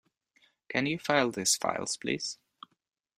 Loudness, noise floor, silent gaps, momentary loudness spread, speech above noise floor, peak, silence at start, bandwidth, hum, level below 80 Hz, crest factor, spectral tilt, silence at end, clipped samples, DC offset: -30 LUFS; -69 dBFS; none; 8 LU; 39 dB; -8 dBFS; 0.7 s; 15.5 kHz; none; -70 dBFS; 24 dB; -2.5 dB/octave; 0.85 s; under 0.1%; under 0.1%